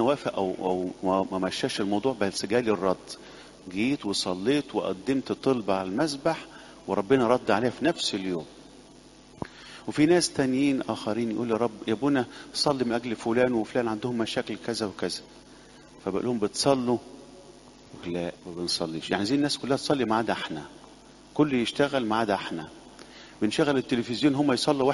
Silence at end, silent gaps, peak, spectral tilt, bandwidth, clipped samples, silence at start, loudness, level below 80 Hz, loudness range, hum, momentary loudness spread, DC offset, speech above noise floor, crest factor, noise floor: 0 s; none; -6 dBFS; -4.5 dB/octave; 11.5 kHz; under 0.1%; 0 s; -27 LUFS; -60 dBFS; 3 LU; none; 14 LU; under 0.1%; 25 dB; 20 dB; -51 dBFS